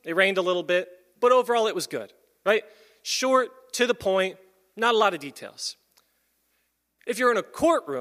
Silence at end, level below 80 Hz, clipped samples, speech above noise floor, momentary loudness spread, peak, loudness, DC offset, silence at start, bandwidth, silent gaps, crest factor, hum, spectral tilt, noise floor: 0 s; -68 dBFS; under 0.1%; 49 dB; 14 LU; -6 dBFS; -24 LUFS; under 0.1%; 0.05 s; 15.5 kHz; none; 20 dB; none; -3 dB/octave; -73 dBFS